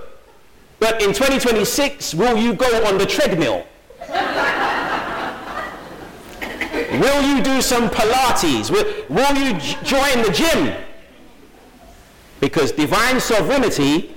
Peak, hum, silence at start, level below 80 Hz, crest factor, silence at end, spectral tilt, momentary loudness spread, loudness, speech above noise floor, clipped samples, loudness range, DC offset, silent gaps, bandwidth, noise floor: -6 dBFS; none; 0 s; -38 dBFS; 12 dB; 0 s; -3.5 dB/octave; 11 LU; -17 LUFS; 32 dB; under 0.1%; 4 LU; under 0.1%; none; 17.5 kHz; -48 dBFS